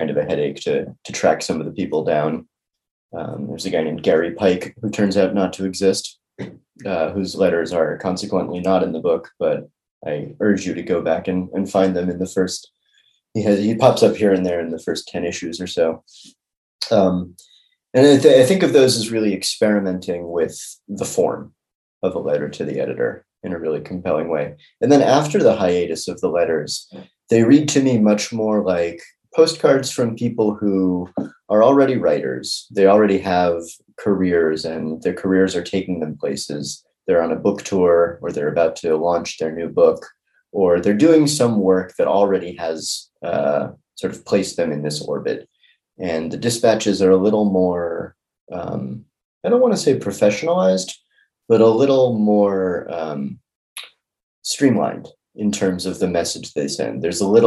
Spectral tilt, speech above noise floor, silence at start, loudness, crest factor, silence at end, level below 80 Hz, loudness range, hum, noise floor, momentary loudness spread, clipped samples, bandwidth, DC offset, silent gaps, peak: -5.5 dB/octave; 43 dB; 0 s; -19 LUFS; 18 dB; 0 s; -58 dBFS; 6 LU; none; -61 dBFS; 14 LU; under 0.1%; 12.5 kHz; under 0.1%; 2.91-3.09 s, 9.91-10.01 s, 16.57-16.79 s, 21.75-22.01 s, 48.41-48.47 s, 49.25-49.41 s, 53.55-53.76 s, 54.23-54.42 s; 0 dBFS